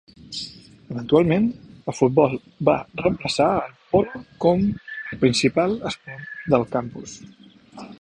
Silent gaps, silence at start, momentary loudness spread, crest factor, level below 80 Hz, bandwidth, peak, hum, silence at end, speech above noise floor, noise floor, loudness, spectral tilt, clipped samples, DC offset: none; 0.25 s; 16 LU; 20 dB; -52 dBFS; 10.5 kHz; -2 dBFS; none; 0.1 s; 21 dB; -42 dBFS; -22 LUFS; -6 dB/octave; under 0.1%; under 0.1%